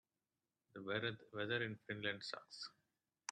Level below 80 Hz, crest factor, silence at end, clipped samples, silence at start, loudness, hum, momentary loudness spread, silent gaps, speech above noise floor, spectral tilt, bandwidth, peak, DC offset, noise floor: -86 dBFS; 22 dB; 0 s; under 0.1%; 0.75 s; -45 LUFS; none; 12 LU; none; over 45 dB; -4 dB/octave; 9.6 kHz; -24 dBFS; under 0.1%; under -90 dBFS